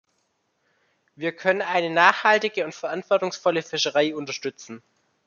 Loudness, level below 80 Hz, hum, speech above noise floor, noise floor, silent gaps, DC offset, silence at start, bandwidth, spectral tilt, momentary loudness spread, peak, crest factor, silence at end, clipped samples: -23 LUFS; -76 dBFS; none; 49 dB; -72 dBFS; none; under 0.1%; 1.2 s; 7.2 kHz; -3 dB/octave; 14 LU; -2 dBFS; 24 dB; 0.5 s; under 0.1%